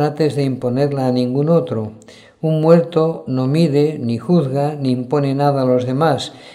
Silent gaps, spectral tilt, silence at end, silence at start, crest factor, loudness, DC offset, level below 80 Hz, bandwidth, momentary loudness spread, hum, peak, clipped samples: none; -8 dB/octave; 0 s; 0 s; 16 dB; -17 LUFS; under 0.1%; -58 dBFS; 12.5 kHz; 8 LU; none; 0 dBFS; under 0.1%